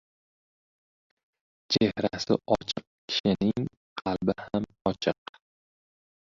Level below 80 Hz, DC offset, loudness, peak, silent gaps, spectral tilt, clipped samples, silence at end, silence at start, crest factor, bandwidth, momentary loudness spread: -58 dBFS; under 0.1%; -29 LUFS; -8 dBFS; 2.87-3.08 s, 3.20-3.24 s, 3.77-3.96 s; -5.5 dB/octave; under 0.1%; 1.25 s; 1.7 s; 24 dB; 7.6 kHz; 10 LU